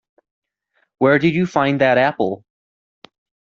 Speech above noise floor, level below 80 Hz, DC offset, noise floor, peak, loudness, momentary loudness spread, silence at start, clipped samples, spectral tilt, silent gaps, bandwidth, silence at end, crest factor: 51 dB; -60 dBFS; under 0.1%; -67 dBFS; -2 dBFS; -17 LUFS; 9 LU; 1 s; under 0.1%; -7 dB/octave; none; 7.2 kHz; 1.15 s; 18 dB